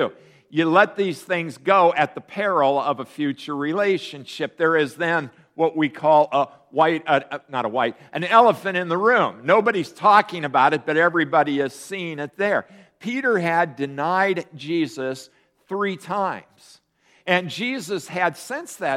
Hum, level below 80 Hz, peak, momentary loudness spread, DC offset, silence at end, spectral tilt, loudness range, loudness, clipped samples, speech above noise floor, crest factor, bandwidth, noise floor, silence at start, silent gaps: none; -72 dBFS; 0 dBFS; 12 LU; under 0.1%; 0 s; -5 dB/octave; 7 LU; -21 LUFS; under 0.1%; 38 dB; 20 dB; 15.5 kHz; -59 dBFS; 0 s; none